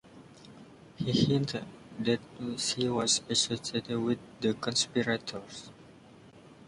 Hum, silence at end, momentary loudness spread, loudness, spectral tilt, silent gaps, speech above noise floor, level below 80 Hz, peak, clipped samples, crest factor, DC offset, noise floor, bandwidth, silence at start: none; 0 s; 16 LU; -30 LUFS; -4 dB/octave; none; 23 dB; -62 dBFS; -14 dBFS; under 0.1%; 20 dB; under 0.1%; -54 dBFS; 11.5 kHz; 0.05 s